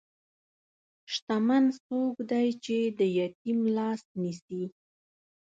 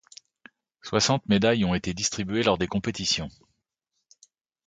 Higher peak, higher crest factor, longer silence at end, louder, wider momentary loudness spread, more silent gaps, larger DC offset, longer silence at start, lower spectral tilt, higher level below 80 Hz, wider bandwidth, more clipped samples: second, -14 dBFS vs -6 dBFS; second, 16 dB vs 22 dB; second, 0.9 s vs 1.4 s; second, -29 LUFS vs -25 LUFS; first, 10 LU vs 6 LU; first, 1.22-1.27 s, 1.80-1.90 s, 3.35-3.45 s, 4.05-4.15 s, 4.42-4.48 s vs none; neither; first, 1.1 s vs 0.85 s; first, -6 dB/octave vs -4 dB/octave; second, -78 dBFS vs -50 dBFS; second, 7.8 kHz vs 9.4 kHz; neither